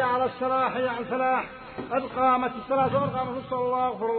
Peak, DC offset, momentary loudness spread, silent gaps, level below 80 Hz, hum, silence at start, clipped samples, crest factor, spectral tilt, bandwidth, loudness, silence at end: -10 dBFS; under 0.1%; 7 LU; none; -58 dBFS; none; 0 s; under 0.1%; 16 dB; -10 dB/octave; 4.5 kHz; -26 LUFS; 0 s